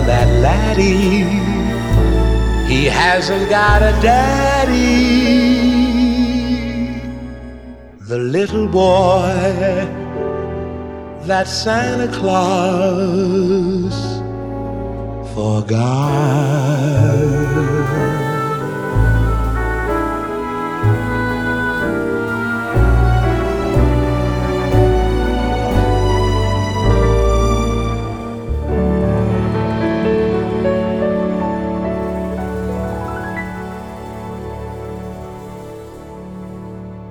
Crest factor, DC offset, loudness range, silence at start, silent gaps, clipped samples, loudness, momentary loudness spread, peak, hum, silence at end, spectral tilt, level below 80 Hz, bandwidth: 16 dB; under 0.1%; 7 LU; 0 s; none; under 0.1%; -16 LUFS; 15 LU; 0 dBFS; none; 0 s; -6.5 dB/octave; -22 dBFS; 16 kHz